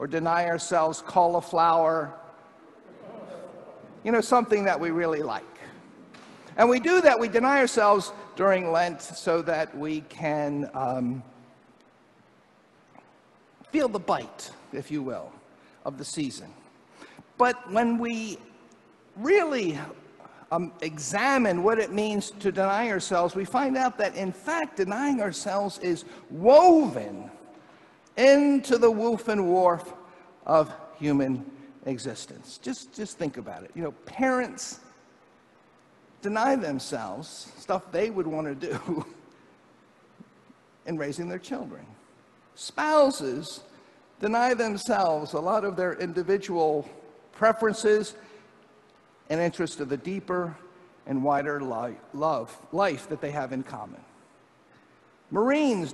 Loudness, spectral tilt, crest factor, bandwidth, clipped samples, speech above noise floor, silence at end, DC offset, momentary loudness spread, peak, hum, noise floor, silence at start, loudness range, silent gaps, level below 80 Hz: -26 LUFS; -5 dB/octave; 24 dB; 12.5 kHz; under 0.1%; 34 dB; 0 s; under 0.1%; 18 LU; -4 dBFS; none; -59 dBFS; 0 s; 10 LU; none; -68 dBFS